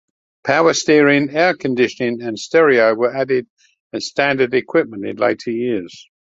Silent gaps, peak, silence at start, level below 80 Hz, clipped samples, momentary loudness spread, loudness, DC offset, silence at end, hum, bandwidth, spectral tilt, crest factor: 3.50-3.57 s, 3.80-3.90 s; 0 dBFS; 0.45 s; -62 dBFS; under 0.1%; 12 LU; -16 LUFS; under 0.1%; 0.35 s; none; 7.8 kHz; -4.5 dB/octave; 16 dB